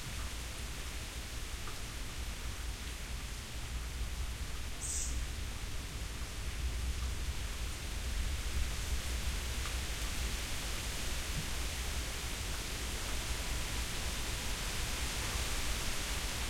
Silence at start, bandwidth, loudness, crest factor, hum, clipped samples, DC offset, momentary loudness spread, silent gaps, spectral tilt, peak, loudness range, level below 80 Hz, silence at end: 0 s; 16.5 kHz; -39 LUFS; 16 dB; none; under 0.1%; under 0.1%; 6 LU; none; -2.5 dB/octave; -22 dBFS; 5 LU; -40 dBFS; 0 s